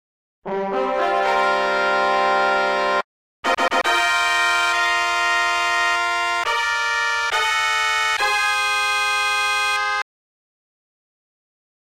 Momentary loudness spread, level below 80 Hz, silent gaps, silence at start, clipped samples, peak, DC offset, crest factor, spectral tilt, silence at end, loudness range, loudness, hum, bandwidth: 6 LU; -56 dBFS; 3.04-3.43 s; 0.45 s; under 0.1%; -6 dBFS; under 0.1%; 14 dB; -0.5 dB/octave; 1.95 s; 2 LU; -19 LUFS; none; 16 kHz